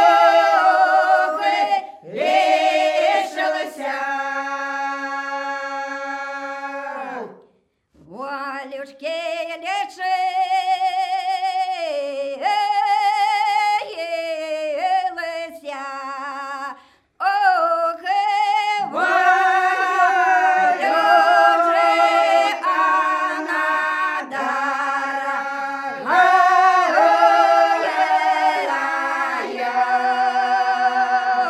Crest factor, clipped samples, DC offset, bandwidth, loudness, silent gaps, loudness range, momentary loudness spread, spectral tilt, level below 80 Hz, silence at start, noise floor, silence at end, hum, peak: 16 dB; under 0.1%; under 0.1%; 13 kHz; -18 LUFS; none; 11 LU; 14 LU; -1.5 dB/octave; -78 dBFS; 0 s; -61 dBFS; 0 s; none; -2 dBFS